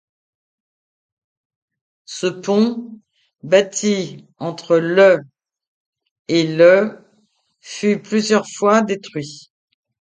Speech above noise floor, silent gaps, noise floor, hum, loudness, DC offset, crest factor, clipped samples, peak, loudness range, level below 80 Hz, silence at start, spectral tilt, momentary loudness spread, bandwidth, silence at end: 46 dB; 5.67-5.93 s, 6.11-6.25 s; -62 dBFS; none; -16 LUFS; under 0.1%; 18 dB; under 0.1%; 0 dBFS; 5 LU; -68 dBFS; 2.1 s; -4.5 dB/octave; 17 LU; 9.4 kHz; 0.7 s